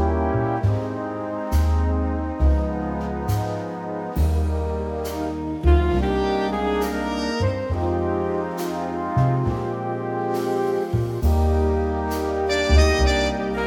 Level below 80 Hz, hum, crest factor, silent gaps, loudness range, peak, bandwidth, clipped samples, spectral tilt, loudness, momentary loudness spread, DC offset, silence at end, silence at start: -26 dBFS; none; 18 dB; none; 3 LU; -4 dBFS; 17 kHz; under 0.1%; -6.5 dB/octave; -23 LUFS; 8 LU; under 0.1%; 0 s; 0 s